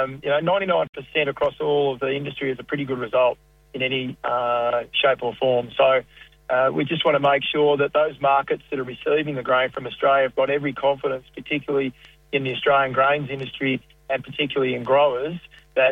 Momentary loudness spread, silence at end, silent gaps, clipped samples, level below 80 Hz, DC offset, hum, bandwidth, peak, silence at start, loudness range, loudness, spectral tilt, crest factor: 9 LU; 0 s; 0.89-0.93 s; under 0.1%; -58 dBFS; under 0.1%; none; 5.8 kHz; -6 dBFS; 0 s; 3 LU; -22 LUFS; -7 dB/octave; 16 dB